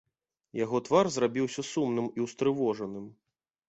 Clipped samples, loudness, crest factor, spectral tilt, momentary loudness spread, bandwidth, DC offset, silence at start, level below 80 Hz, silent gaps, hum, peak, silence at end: under 0.1%; -30 LUFS; 20 dB; -5.5 dB/octave; 14 LU; 8.2 kHz; under 0.1%; 0.55 s; -70 dBFS; none; none; -10 dBFS; 0.55 s